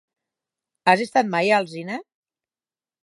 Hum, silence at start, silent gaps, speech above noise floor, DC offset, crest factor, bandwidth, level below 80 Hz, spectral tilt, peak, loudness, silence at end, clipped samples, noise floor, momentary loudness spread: none; 0.85 s; none; over 70 dB; under 0.1%; 22 dB; 11.5 kHz; -78 dBFS; -5 dB/octave; -2 dBFS; -20 LUFS; 1 s; under 0.1%; under -90 dBFS; 13 LU